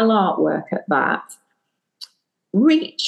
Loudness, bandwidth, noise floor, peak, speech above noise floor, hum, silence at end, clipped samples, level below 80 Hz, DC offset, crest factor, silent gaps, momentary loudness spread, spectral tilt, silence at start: -19 LUFS; 12 kHz; -73 dBFS; -4 dBFS; 55 dB; none; 0 s; under 0.1%; -78 dBFS; under 0.1%; 16 dB; none; 24 LU; -5.5 dB/octave; 0 s